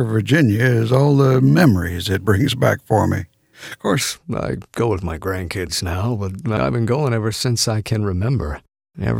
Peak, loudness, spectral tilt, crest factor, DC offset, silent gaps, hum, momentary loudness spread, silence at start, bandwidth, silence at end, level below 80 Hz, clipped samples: 0 dBFS; -18 LUFS; -6 dB/octave; 16 dB; under 0.1%; none; none; 11 LU; 0 s; 17 kHz; 0 s; -40 dBFS; under 0.1%